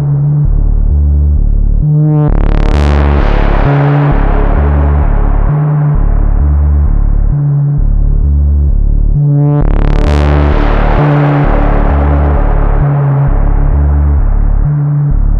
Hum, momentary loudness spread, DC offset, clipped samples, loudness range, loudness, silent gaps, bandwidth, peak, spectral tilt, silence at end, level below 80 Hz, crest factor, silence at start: none; 4 LU; under 0.1%; under 0.1%; 1 LU; -11 LUFS; none; 5 kHz; -2 dBFS; -9.5 dB/octave; 0 s; -10 dBFS; 6 dB; 0 s